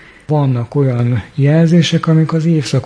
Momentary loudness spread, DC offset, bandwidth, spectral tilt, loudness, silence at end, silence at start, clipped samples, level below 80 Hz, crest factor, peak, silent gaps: 6 LU; under 0.1%; 10 kHz; -7 dB/octave; -13 LUFS; 0 s; 0.3 s; under 0.1%; -48 dBFS; 10 dB; -2 dBFS; none